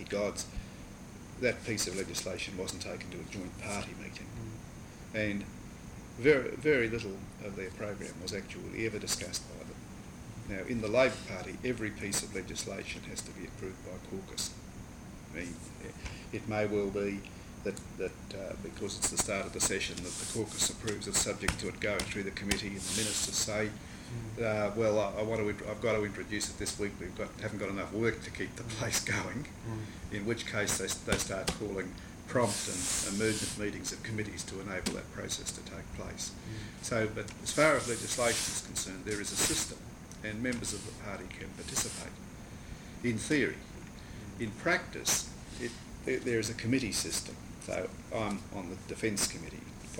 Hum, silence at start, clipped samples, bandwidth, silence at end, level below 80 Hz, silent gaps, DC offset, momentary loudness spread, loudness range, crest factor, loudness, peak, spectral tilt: none; 0 s; under 0.1%; 19.5 kHz; 0 s; -52 dBFS; none; under 0.1%; 15 LU; 6 LU; 24 dB; -34 LUFS; -10 dBFS; -3.5 dB/octave